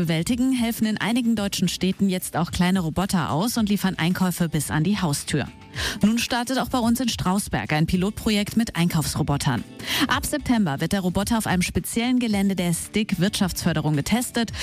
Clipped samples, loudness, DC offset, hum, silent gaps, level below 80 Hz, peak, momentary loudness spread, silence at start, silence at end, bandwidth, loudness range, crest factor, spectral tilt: under 0.1%; -23 LUFS; under 0.1%; none; none; -42 dBFS; -10 dBFS; 3 LU; 0 s; 0 s; 15.5 kHz; 1 LU; 12 dB; -5 dB/octave